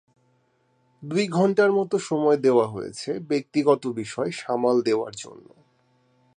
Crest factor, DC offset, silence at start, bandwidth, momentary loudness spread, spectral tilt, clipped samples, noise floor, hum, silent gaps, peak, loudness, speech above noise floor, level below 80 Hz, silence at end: 18 dB; under 0.1%; 1 s; 10 kHz; 12 LU; -6 dB/octave; under 0.1%; -66 dBFS; none; none; -6 dBFS; -23 LUFS; 43 dB; -70 dBFS; 1 s